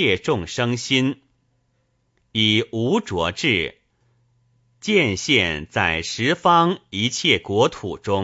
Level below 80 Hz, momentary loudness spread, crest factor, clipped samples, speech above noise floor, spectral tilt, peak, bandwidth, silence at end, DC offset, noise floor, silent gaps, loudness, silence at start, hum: -50 dBFS; 7 LU; 20 dB; under 0.1%; 47 dB; -4 dB/octave; -2 dBFS; 8 kHz; 0 s; under 0.1%; -67 dBFS; none; -20 LUFS; 0 s; none